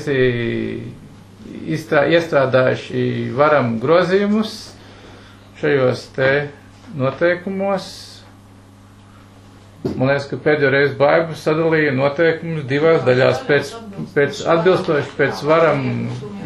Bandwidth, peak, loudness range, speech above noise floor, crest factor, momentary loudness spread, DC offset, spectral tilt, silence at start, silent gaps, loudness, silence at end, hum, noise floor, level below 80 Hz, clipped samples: 12.5 kHz; 0 dBFS; 7 LU; 27 dB; 16 dB; 13 LU; under 0.1%; -6.5 dB/octave; 0 s; none; -17 LUFS; 0 s; none; -44 dBFS; -50 dBFS; under 0.1%